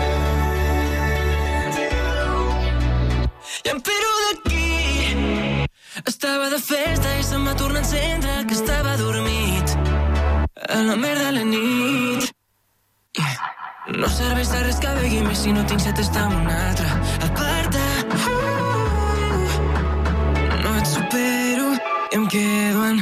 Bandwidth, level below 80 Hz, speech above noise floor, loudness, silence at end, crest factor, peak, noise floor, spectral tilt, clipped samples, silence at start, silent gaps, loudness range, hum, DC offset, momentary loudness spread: 16 kHz; -26 dBFS; 47 dB; -21 LUFS; 0 s; 12 dB; -8 dBFS; -66 dBFS; -4.5 dB/octave; under 0.1%; 0 s; none; 2 LU; none; under 0.1%; 4 LU